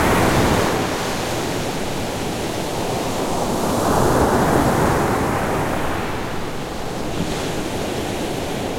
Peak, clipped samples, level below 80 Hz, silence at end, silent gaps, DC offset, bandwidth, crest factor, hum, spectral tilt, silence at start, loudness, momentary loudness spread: -2 dBFS; under 0.1%; -34 dBFS; 0 s; none; under 0.1%; 16.5 kHz; 18 dB; none; -5 dB/octave; 0 s; -21 LUFS; 8 LU